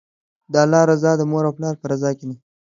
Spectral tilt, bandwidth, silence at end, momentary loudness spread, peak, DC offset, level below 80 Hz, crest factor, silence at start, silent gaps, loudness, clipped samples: -6.5 dB/octave; 7.6 kHz; 0.35 s; 12 LU; 0 dBFS; under 0.1%; -64 dBFS; 18 dB; 0.5 s; none; -18 LUFS; under 0.1%